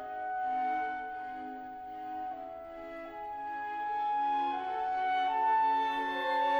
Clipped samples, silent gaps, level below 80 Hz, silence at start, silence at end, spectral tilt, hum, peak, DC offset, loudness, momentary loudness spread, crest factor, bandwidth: under 0.1%; none; -68 dBFS; 0 s; 0 s; -4 dB/octave; none; -18 dBFS; under 0.1%; -33 LUFS; 15 LU; 14 dB; over 20 kHz